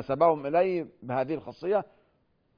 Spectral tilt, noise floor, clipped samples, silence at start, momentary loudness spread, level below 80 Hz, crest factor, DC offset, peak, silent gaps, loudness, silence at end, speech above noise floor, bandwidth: -9 dB/octave; -70 dBFS; under 0.1%; 0 s; 10 LU; -66 dBFS; 18 dB; under 0.1%; -10 dBFS; none; -28 LUFS; 0.75 s; 42 dB; 5.2 kHz